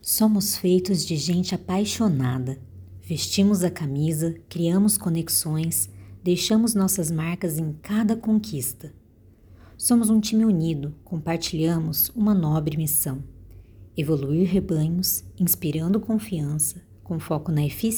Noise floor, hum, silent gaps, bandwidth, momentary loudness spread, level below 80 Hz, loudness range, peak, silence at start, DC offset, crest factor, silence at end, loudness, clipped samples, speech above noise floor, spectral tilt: -53 dBFS; none; none; over 20 kHz; 10 LU; -50 dBFS; 2 LU; -8 dBFS; 0.05 s; under 0.1%; 16 dB; 0 s; -23 LUFS; under 0.1%; 30 dB; -5 dB/octave